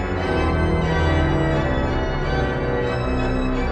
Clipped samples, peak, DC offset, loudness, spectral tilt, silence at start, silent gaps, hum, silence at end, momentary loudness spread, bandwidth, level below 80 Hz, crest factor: under 0.1%; -8 dBFS; under 0.1%; -21 LUFS; -7.5 dB/octave; 0 s; none; none; 0 s; 3 LU; 8.6 kHz; -26 dBFS; 12 dB